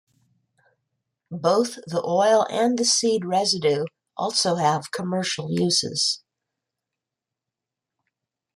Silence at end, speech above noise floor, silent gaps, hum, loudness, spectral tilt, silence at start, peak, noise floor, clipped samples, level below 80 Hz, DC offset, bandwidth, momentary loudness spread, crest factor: 2.4 s; 65 dB; none; none; -22 LUFS; -3.5 dB/octave; 1.3 s; -6 dBFS; -87 dBFS; under 0.1%; -70 dBFS; under 0.1%; 14.5 kHz; 9 LU; 18 dB